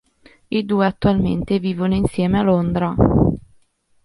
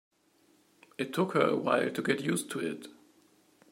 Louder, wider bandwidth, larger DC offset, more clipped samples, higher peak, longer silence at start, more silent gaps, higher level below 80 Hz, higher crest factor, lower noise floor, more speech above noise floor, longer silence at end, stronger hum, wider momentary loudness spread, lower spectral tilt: first, -18 LUFS vs -31 LUFS; second, 11.5 kHz vs 16 kHz; neither; neither; first, -2 dBFS vs -10 dBFS; second, 0.5 s vs 1 s; neither; first, -34 dBFS vs -80 dBFS; second, 16 dB vs 24 dB; second, -58 dBFS vs -67 dBFS; first, 41 dB vs 37 dB; second, 0.65 s vs 0.8 s; neither; second, 5 LU vs 16 LU; first, -8.5 dB/octave vs -5 dB/octave